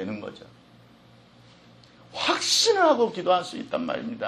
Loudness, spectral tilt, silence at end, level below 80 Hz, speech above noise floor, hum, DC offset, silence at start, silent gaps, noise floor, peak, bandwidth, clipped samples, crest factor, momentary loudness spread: -23 LUFS; -2 dB/octave; 0 s; -68 dBFS; 30 dB; none; under 0.1%; 0 s; none; -54 dBFS; -8 dBFS; 13.5 kHz; under 0.1%; 20 dB; 17 LU